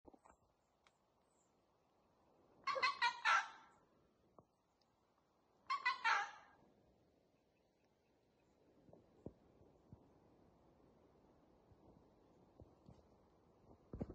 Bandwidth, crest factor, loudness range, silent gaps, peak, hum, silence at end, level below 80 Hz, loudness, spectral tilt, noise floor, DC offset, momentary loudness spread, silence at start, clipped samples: 8.4 kHz; 26 dB; 4 LU; none; -22 dBFS; none; 0 s; -76 dBFS; -40 LUFS; -2 dB/octave; -80 dBFS; under 0.1%; 24 LU; 2.65 s; under 0.1%